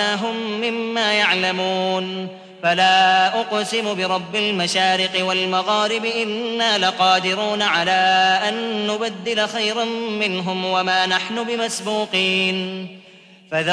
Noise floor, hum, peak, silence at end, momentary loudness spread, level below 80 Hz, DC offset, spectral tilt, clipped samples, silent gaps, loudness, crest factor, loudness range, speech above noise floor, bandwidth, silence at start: -47 dBFS; none; -4 dBFS; 0 s; 8 LU; -68 dBFS; under 0.1%; -3 dB/octave; under 0.1%; none; -19 LUFS; 16 dB; 3 LU; 27 dB; 11 kHz; 0 s